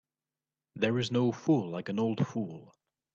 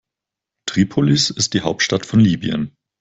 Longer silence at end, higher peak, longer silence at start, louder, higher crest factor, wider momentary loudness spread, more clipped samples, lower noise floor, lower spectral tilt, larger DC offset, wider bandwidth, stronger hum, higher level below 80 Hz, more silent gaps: first, 0.5 s vs 0.35 s; second, -14 dBFS vs -2 dBFS; about the same, 0.75 s vs 0.65 s; second, -31 LUFS vs -17 LUFS; about the same, 18 dB vs 16 dB; about the same, 9 LU vs 9 LU; neither; first, under -90 dBFS vs -85 dBFS; first, -7 dB/octave vs -4.5 dB/octave; neither; about the same, 7.8 kHz vs 8.4 kHz; neither; second, -72 dBFS vs -50 dBFS; neither